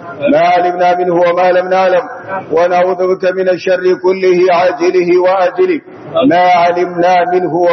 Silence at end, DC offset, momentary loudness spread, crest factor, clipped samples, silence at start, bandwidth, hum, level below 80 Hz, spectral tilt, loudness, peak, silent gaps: 0 s; under 0.1%; 5 LU; 10 dB; under 0.1%; 0 s; 6.2 kHz; none; -62 dBFS; -6.5 dB/octave; -11 LUFS; 0 dBFS; none